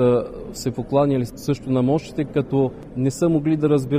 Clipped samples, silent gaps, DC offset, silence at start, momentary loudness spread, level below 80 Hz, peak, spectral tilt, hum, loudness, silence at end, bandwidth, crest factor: under 0.1%; none; under 0.1%; 0 s; 7 LU; -46 dBFS; -6 dBFS; -7.5 dB/octave; none; -21 LUFS; 0 s; 15.5 kHz; 14 dB